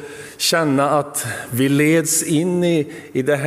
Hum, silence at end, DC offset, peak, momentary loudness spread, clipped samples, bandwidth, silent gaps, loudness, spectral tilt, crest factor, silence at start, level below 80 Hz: none; 0 s; under 0.1%; -4 dBFS; 9 LU; under 0.1%; 16 kHz; none; -18 LUFS; -4 dB/octave; 14 dB; 0 s; -60 dBFS